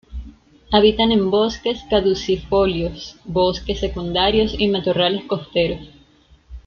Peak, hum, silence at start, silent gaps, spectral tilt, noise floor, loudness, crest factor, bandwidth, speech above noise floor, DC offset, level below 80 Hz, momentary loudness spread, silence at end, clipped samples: -2 dBFS; none; 0.1 s; none; -6 dB/octave; -52 dBFS; -19 LUFS; 18 dB; 6.8 kHz; 34 dB; under 0.1%; -36 dBFS; 9 LU; 0.05 s; under 0.1%